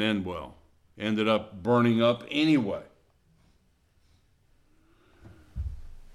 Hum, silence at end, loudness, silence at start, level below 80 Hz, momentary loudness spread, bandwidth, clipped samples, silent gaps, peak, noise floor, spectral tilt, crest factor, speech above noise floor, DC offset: none; 0.05 s; -27 LUFS; 0 s; -48 dBFS; 17 LU; 12 kHz; under 0.1%; none; -10 dBFS; -66 dBFS; -7 dB/octave; 18 dB; 40 dB; under 0.1%